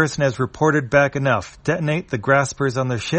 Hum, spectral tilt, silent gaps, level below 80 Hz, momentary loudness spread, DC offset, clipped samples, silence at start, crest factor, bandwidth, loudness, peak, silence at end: none; -5.5 dB/octave; none; -48 dBFS; 6 LU; under 0.1%; under 0.1%; 0 s; 18 dB; 8.8 kHz; -20 LUFS; -2 dBFS; 0 s